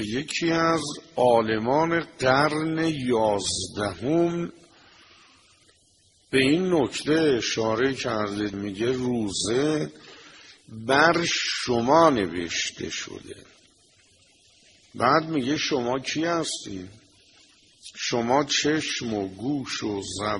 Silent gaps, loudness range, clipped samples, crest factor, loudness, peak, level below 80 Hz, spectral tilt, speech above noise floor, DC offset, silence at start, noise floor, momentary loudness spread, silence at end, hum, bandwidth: none; 5 LU; under 0.1%; 22 dB; -24 LUFS; -4 dBFS; -56 dBFS; -4 dB/octave; 37 dB; under 0.1%; 0 s; -61 dBFS; 11 LU; 0 s; none; 11.5 kHz